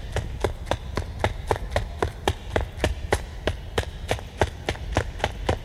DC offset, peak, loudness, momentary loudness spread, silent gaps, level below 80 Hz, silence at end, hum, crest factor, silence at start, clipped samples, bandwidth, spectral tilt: under 0.1%; -6 dBFS; -28 LUFS; 4 LU; none; -34 dBFS; 0 s; none; 22 dB; 0 s; under 0.1%; 15 kHz; -5 dB/octave